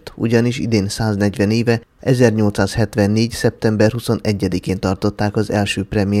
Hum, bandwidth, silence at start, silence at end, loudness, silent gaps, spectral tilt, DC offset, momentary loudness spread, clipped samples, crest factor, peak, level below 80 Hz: none; 14.5 kHz; 0.05 s; 0 s; -17 LUFS; none; -6.5 dB/octave; under 0.1%; 5 LU; under 0.1%; 16 dB; 0 dBFS; -42 dBFS